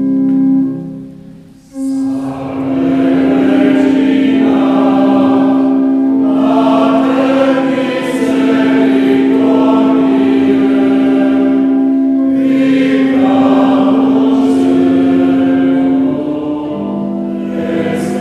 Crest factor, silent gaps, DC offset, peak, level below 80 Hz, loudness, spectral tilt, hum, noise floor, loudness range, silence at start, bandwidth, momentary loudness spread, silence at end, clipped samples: 10 dB; none; under 0.1%; 0 dBFS; -50 dBFS; -11 LUFS; -7 dB/octave; none; -35 dBFS; 3 LU; 0 s; 9 kHz; 8 LU; 0 s; under 0.1%